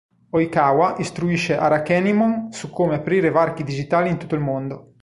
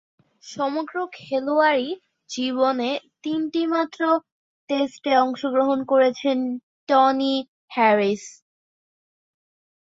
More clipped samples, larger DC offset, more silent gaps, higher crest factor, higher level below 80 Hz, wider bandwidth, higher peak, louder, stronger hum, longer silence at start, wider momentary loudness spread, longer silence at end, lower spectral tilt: neither; neither; second, none vs 4.32-4.68 s, 6.63-6.87 s, 7.48-7.68 s; about the same, 16 dB vs 18 dB; first, -52 dBFS vs -72 dBFS; first, 11.5 kHz vs 7.8 kHz; about the same, -4 dBFS vs -6 dBFS; about the same, -20 LUFS vs -22 LUFS; neither; about the same, 0.35 s vs 0.45 s; second, 8 LU vs 12 LU; second, 0.2 s vs 1.5 s; first, -6.5 dB/octave vs -4.5 dB/octave